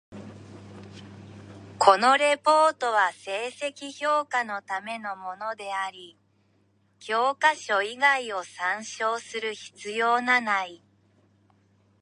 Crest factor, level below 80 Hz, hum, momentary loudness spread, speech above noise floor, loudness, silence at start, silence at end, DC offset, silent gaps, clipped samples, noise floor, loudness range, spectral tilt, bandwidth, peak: 24 dB; -70 dBFS; none; 25 LU; 40 dB; -25 LUFS; 0.1 s; 1.25 s; under 0.1%; none; under 0.1%; -66 dBFS; 8 LU; -2.5 dB/octave; 11 kHz; -2 dBFS